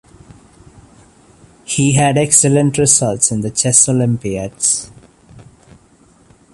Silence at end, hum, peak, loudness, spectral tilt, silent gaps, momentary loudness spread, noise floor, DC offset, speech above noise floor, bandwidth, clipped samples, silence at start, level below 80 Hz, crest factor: 1.15 s; none; 0 dBFS; -13 LUFS; -4 dB/octave; none; 9 LU; -49 dBFS; under 0.1%; 36 dB; 13 kHz; under 0.1%; 1.7 s; -48 dBFS; 16 dB